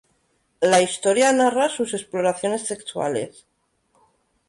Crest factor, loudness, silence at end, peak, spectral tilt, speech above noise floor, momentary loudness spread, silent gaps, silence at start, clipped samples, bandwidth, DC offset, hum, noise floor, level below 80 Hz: 18 dB; -21 LUFS; 1.2 s; -6 dBFS; -3 dB/octave; 46 dB; 10 LU; none; 0.6 s; under 0.1%; 11.5 kHz; under 0.1%; none; -67 dBFS; -66 dBFS